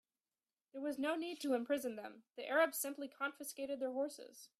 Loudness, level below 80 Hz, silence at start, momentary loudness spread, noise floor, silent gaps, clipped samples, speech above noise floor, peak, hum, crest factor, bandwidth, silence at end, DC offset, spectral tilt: -40 LUFS; -88 dBFS; 0.75 s; 15 LU; under -90 dBFS; none; under 0.1%; over 49 dB; -22 dBFS; none; 20 dB; 15.5 kHz; 0.15 s; under 0.1%; -2 dB/octave